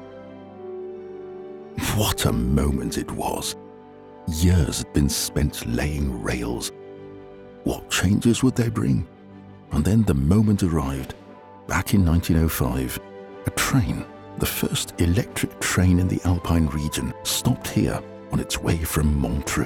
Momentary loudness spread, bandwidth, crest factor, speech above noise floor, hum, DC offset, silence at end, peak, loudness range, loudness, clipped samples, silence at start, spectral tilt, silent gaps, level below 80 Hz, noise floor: 17 LU; 19 kHz; 16 dB; 22 dB; none; under 0.1%; 0 s; -6 dBFS; 4 LU; -23 LUFS; under 0.1%; 0 s; -5 dB/octave; none; -34 dBFS; -44 dBFS